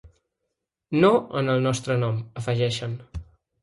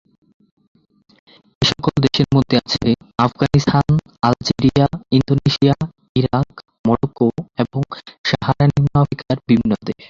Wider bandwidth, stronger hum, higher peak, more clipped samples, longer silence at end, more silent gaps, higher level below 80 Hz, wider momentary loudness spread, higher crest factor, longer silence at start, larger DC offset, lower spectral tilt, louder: first, 11.5 kHz vs 7.4 kHz; neither; second, -6 dBFS vs -2 dBFS; neither; first, 0.4 s vs 0.15 s; second, none vs 6.09-6.15 s, 6.79-6.84 s, 8.18-8.24 s; second, -50 dBFS vs -42 dBFS; first, 15 LU vs 7 LU; about the same, 18 dB vs 16 dB; second, 0.05 s vs 1.6 s; neither; about the same, -6 dB/octave vs -7 dB/octave; second, -24 LUFS vs -17 LUFS